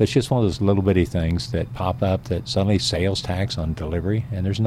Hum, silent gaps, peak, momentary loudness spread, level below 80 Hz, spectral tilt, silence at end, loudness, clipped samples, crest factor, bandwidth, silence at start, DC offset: none; none; -6 dBFS; 6 LU; -38 dBFS; -6.5 dB/octave; 0 s; -22 LUFS; under 0.1%; 16 dB; 13 kHz; 0 s; under 0.1%